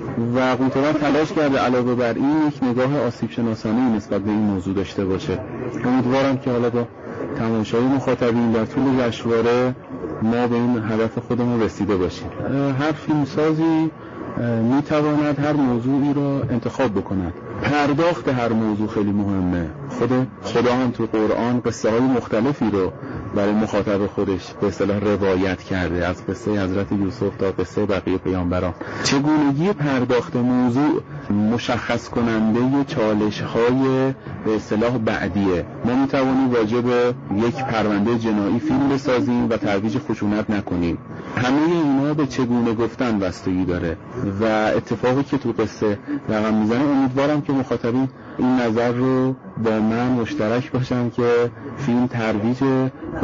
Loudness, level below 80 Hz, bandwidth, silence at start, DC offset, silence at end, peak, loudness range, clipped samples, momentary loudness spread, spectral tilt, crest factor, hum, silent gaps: -20 LUFS; -48 dBFS; 7.4 kHz; 0 s; under 0.1%; 0 s; -8 dBFS; 2 LU; under 0.1%; 6 LU; -6 dB/octave; 12 dB; none; none